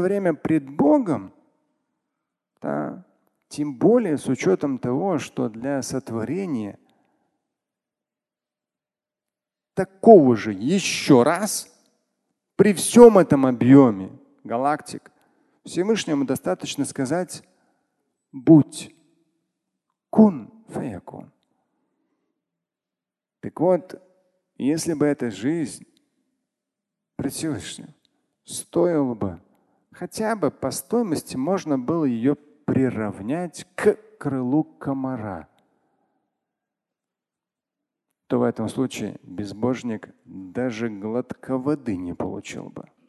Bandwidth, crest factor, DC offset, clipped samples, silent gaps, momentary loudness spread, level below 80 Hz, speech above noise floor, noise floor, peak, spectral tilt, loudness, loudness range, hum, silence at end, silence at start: 12.5 kHz; 22 dB; under 0.1%; under 0.1%; none; 19 LU; -58 dBFS; over 69 dB; under -90 dBFS; 0 dBFS; -6 dB/octave; -21 LUFS; 13 LU; none; 0.25 s; 0 s